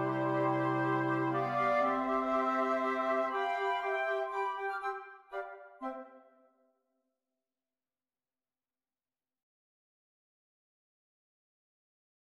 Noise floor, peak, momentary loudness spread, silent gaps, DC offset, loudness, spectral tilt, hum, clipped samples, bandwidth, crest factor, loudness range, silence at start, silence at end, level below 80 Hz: under -90 dBFS; -20 dBFS; 13 LU; none; under 0.1%; -33 LUFS; -7 dB/octave; none; under 0.1%; 11.5 kHz; 16 dB; 17 LU; 0 s; 6.2 s; -74 dBFS